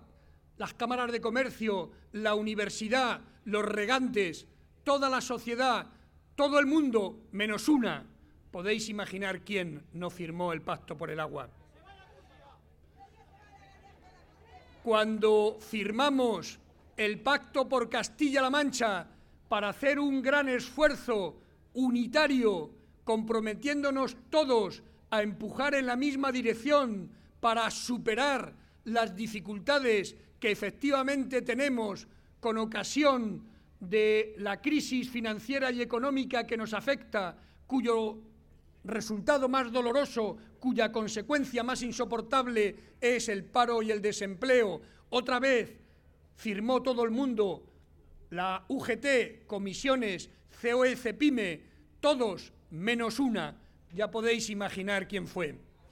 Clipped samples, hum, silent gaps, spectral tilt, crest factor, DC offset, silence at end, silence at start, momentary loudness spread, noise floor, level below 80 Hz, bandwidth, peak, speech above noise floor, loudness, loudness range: under 0.1%; none; none; -4 dB/octave; 20 dB; under 0.1%; 0.3 s; 0.6 s; 11 LU; -61 dBFS; -60 dBFS; 16.5 kHz; -12 dBFS; 30 dB; -31 LUFS; 4 LU